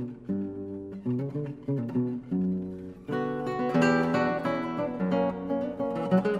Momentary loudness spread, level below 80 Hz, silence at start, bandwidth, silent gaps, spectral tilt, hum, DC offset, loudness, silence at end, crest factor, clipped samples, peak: 10 LU; -60 dBFS; 0 s; 10 kHz; none; -8 dB/octave; none; under 0.1%; -29 LUFS; 0 s; 18 dB; under 0.1%; -10 dBFS